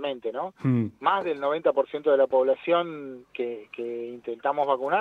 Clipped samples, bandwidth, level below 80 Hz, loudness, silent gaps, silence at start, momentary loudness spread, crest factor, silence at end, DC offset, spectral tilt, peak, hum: under 0.1%; 4.5 kHz; -74 dBFS; -26 LUFS; none; 0 s; 12 LU; 18 dB; 0 s; under 0.1%; -8.5 dB/octave; -8 dBFS; none